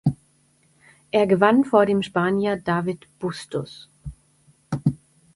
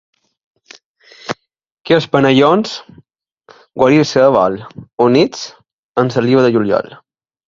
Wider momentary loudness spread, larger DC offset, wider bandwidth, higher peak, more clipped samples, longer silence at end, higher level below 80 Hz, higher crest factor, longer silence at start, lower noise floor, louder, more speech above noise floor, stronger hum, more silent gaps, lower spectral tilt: first, 23 LU vs 19 LU; neither; first, 11.5 kHz vs 7.6 kHz; second, -4 dBFS vs 0 dBFS; neither; second, 0.4 s vs 0.55 s; about the same, -52 dBFS vs -54 dBFS; about the same, 20 dB vs 16 dB; second, 0.05 s vs 1.25 s; first, -61 dBFS vs -49 dBFS; second, -22 LUFS vs -13 LUFS; first, 41 dB vs 37 dB; neither; second, none vs 1.72-1.85 s, 5.73-5.95 s; about the same, -7 dB/octave vs -6 dB/octave